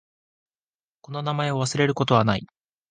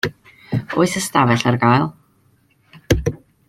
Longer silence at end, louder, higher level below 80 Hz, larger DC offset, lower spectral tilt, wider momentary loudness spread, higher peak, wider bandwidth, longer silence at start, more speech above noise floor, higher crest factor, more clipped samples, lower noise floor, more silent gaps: first, 0.45 s vs 0.3 s; second, -23 LUFS vs -18 LUFS; second, -56 dBFS vs -38 dBFS; neither; about the same, -5.5 dB/octave vs -5.5 dB/octave; about the same, 10 LU vs 11 LU; about the same, -4 dBFS vs -2 dBFS; second, 9.6 kHz vs 16 kHz; first, 1.1 s vs 0.05 s; first, over 67 dB vs 42 dB; about the same, 22 dB vs 18 dB; neither; first, under -90 dBFS vs -58 dBFS; neither